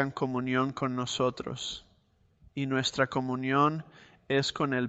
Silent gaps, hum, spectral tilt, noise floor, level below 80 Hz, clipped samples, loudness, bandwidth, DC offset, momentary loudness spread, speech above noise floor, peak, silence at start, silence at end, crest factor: none; none; -5 dB/octave; -67 dBFS; -62 dBFS; under 0.1%; -30 LUFS; 8.2 kHz; under 0.1%; 10 LU; 37 dB; -12 dBFS; 0 s; 0 s; 18 dB